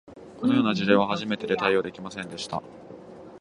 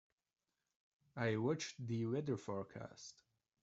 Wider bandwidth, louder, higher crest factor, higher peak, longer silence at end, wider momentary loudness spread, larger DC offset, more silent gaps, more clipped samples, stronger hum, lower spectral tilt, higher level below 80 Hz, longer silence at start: first, 11 kHz vs 8 kHz; first, -25 LUFS vs -42 LUFS; about the same, 22 dB vs 20 dB; first, -6 dBFS vs -24 dBFS; second, 0 s vs 0.5 s; first, 23 LU vs 17 LU; neither; neither; neither; neither; about the same, -5.5 dB/octave vs -6 dB/octave; first, -62 dBFS vs -80 dBFS; second, 0.1 s vs 1.15 s